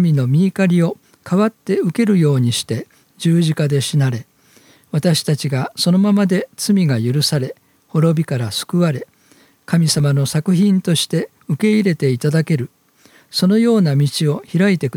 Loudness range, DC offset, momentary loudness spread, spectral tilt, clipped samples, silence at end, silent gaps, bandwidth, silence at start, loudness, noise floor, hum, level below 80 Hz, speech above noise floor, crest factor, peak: 2 LU; under 0.1%; 8 LU; -6 dB/octave; under 0.1%; 0 s; none; 17 kHz; 0 s; -17 LUFS; -52 dBFS; none; -60 dBFS; 37 dB; 14 dB; -2 dBFS